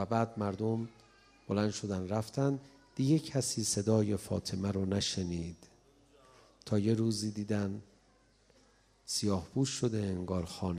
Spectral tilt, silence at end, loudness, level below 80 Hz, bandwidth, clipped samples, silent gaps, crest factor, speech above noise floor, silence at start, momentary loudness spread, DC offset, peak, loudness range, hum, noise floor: -5.5 dB/octave; 0 s; -34 LUFS; -62 dBFS; 15.5 kHz; under 0.1%; none; 20 dB; 34 dB; 0 s; 9 LU; under 0.1%; -16 dBFS; 4 LU; none; -67 dBFS